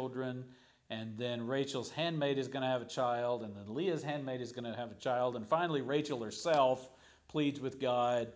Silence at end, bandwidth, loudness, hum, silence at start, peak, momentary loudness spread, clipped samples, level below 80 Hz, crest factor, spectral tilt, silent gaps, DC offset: 0 s; 8 kHz; -36 LUFS; none; 0 s; -16 dBFS; 10 LU; under 0.1%; -74 dBFS; 18 dB; -5.5 dB/octave; none; under 0.1%